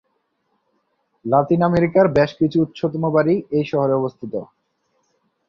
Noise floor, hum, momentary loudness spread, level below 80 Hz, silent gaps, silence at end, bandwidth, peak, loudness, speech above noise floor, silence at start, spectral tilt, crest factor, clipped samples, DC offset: -69 dBFS; none; 13 LU; -54 dBFS; none; 1.05 s; 6.8 kHz; -2 dBFS; -19 LUFS; 52 dB; 1.25 s; -9 dB/octave; 18 dB; under 0.1%; under 0.1%